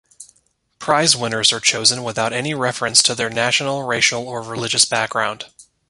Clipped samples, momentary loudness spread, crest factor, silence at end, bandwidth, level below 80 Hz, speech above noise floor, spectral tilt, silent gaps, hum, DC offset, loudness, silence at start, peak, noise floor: under 0.1%; 11 LU; 20 dB; 0.3 s; 16 kHz; -58 dBFS; 44 dB; -1.5 dB/octave; none; none; under 0.1%; -17 LUFS; 0.2 s; 0 dBFS; -62 dBFS